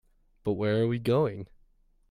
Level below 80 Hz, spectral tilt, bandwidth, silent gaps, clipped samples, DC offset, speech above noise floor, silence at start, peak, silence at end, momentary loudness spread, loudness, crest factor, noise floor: -58 dBFS; -8.5 dB/octave; 15 kHz; none; under 0.1%; under 0.1%; 36 dB; 0.45 s; -14 dBFS; 0.65 s; 15 LU; -28 LUFS; 16 dB; -63 dBFS